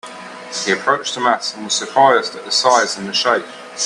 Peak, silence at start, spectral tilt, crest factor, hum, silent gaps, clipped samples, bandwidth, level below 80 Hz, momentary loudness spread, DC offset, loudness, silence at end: 0 dBFS; 0.05 s; -1.5 dB/octave; 18 dB; none; none; under 0.1%; 11.5 kHz; -68 dBFS; 12 LU; under 0.1%; -16 LUFS; 0 s